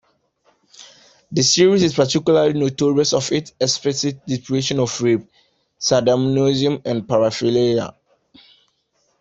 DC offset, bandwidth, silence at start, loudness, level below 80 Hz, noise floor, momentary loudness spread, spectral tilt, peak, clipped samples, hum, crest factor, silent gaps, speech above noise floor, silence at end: under 0.1%; 8.2 kHz; 0.8 s; -18 LUFS; -56 dBFS; -66 dBFS; 8 LU; -4.5 dB/octave; -2 dBFS; under 0.1%; none; 18 dB; none; 48 dB; 1.3 s